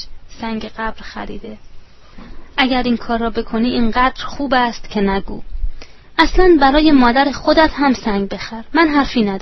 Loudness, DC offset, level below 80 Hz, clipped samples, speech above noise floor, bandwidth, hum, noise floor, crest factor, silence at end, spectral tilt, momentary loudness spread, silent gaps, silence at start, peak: -15 LUFS; under 0.1%; -28 dBFS; under 0.1%; 21 dB; 6.2 kHz; none; -36 dBFS; 16 dB; 0 s; -5.5 dB/octave; 19 LU; none; 0 s; 0 dBFS